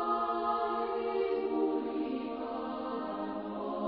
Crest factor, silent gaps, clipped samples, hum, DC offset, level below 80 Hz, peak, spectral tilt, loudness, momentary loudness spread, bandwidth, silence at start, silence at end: 14 dB; none; under 0.1%; none; under 0.1%; -68 dBFS; -20 dBFS; -4 dB/octave; -34 LUFS; 6 LU; 5.2 kHz; 0 s; 0 s